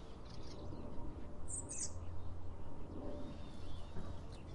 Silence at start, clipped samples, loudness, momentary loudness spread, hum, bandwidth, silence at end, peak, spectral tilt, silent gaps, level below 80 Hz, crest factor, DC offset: 0 s; under 0.1%; -49 LUFS; 9 LU; none; 10.5 kHz; 0 s; -30 dBFS; -4.5 dB/octave; none; -52 dBFS; 12 dB; under 0.1%